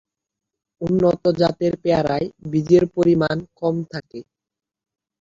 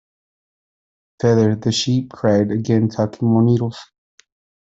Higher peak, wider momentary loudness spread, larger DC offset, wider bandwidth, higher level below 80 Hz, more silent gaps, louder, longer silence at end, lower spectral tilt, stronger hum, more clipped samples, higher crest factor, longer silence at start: about the same, -2 dBFS vs -4 dBFS; first, 14 LU vs 5 LU; neither; about the same, 7.6 kHz vs 8 kHz; about the same, -52 dBFS vs -56 dBFS; neither; about the same, -20 LUFS vs -18 LUFS; first, 1 s vs 0.85 s; first, -8 dB/octave vs -6.5 dB/octave; neither; neither; about the same, 18 dB vs 16 dB; second, 0.8 s vs 1.25 s